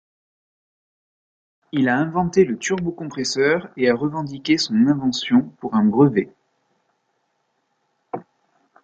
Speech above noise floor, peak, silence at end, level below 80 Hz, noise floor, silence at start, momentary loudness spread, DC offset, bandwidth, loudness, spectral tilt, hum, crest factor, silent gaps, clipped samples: 51 dB; -4 dBFS; 0.65 s; -58 dBFS; -70 dBFS; 1.75 s; 11 LU; under 0.1%; 9 kHz; -20 LUFS; -5.5 dB/octave; none; 18 dB; none; under 0.1%